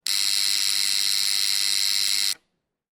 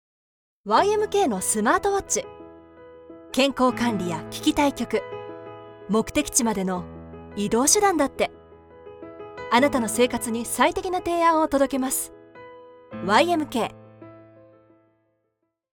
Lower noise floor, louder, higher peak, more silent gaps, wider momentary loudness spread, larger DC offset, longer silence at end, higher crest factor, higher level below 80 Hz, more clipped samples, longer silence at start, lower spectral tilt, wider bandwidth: about the same, -75 dBFS vs -76 dBFS; about the same, -20 LUFS vs -22 LUFS; about the same, -6 dBFS vs -4 dBFS; neither; second, 2 LU vs 19 LU; neither; second, 0.6 s vs 1.6 s; about the same, 18 dB vs 22 dB; second, -76 dBFS vs -52 dBFS; neither; second, 0.05 s vs 0.65 s; second, 4.5 dB/octave vs -3 dB/octave; second, 17 kHz vs over 20 kHz